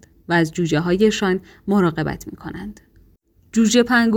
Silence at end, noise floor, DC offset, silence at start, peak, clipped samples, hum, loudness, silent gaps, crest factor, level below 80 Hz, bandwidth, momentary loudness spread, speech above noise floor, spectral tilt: 0 s; -55 dBFS; under 0.1%; 0.3 s; -4 dBFS; under 0.1%; none; -19 LUFS; none; 16 dB; -48 dBFS; 17 kHz; 17 LU; 37 dB; -5 dB/octave